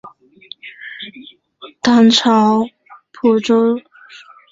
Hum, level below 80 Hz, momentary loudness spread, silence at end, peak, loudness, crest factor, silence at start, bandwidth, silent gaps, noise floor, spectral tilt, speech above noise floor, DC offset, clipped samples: none; -58 dBFS; 22 LU; 0.75 s; 0 dBFS; -14 LUFS; 16 dB; 0.05 s; 7.8 kHz; none; -41 dBFS; -4.5 dB/octave; 30 dB; under 0.1%; under 0.1%